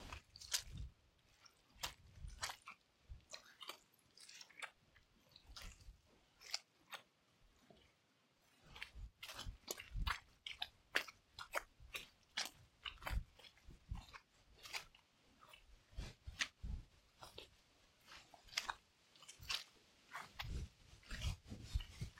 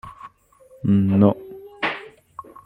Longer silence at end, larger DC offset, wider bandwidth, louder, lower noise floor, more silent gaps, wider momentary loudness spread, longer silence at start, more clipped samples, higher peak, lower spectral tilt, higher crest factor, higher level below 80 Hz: second, 0 s vs 0.25 s; neither; first, 16.5 kHz vs 5.4 kHz; second, -49 LUFS vs -20 LUFS; first, -78 dBFS vs -52 dBFS; neither; second, 20 LU vs 24 LU; about the same, 0 s vs 0.05 s; neither; second, -18 dBFS vs -4 dBFS; second, -2 dB/octave vs -9 dB/octave; first, 34 dB vs 20 dB; about the same, -56 dBFS vs -58 dBFS